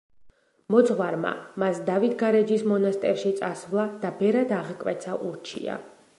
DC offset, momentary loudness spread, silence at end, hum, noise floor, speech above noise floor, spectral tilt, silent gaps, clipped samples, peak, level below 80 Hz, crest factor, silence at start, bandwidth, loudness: under 0.1%; 11 LU; 0.3 s; none; -55 dBFS; 30 dB; -6.5 dB/octave; none; under 0.1%; -6 dBFS; -72 dBFS; 18 dB; 0.2 s; 11.5 kHz; -25 LUFS